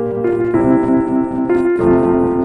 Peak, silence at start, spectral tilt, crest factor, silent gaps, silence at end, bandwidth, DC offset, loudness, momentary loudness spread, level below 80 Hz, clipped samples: -2 dBFS; 0 s; -10 dB/octave; 12 dB; none; 0 s; 3.2 kHz; under 0.1%; -14 LUFS; 4 LU; -38 dBFS; under 0.1%